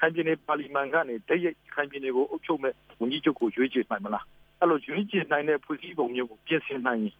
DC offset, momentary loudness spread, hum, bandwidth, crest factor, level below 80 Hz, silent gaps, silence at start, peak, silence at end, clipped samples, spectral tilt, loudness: under 0.1%; 6 LU; none; 4.9 kHz; 20 dB; -70 dBFS; none; 0 s; -8 dBFS; 0.1 s; under 0.1%; -8 dB/octave; -29 LUFS